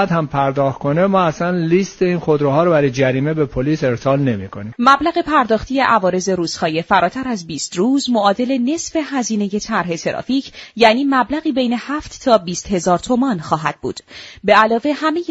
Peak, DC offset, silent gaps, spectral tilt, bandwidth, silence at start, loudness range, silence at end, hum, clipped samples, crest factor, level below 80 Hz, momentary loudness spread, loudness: 0 dBFS; under 0.1%; none; -5.5 dB/octave; 8.2 kHz; 0 s; 2 LU; 0.05 s; none; under 0.1%; 16 dB; -46 dBFS; 9 LU; -16 LUFS